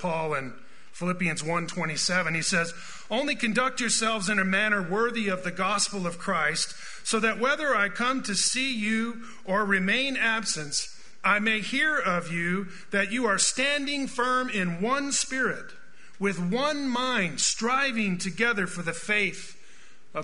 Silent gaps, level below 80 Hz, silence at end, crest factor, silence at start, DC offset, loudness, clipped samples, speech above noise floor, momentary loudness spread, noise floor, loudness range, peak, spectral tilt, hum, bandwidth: none; -60 dBFS; 0 s; 20 dB; 0 s; 1%; -26 LUFS; under 0.1%; 29 dB; 8 LU; -56 dBFS; 2 LU; -8 dBFS; -3 dB/octave; none; 11 kHz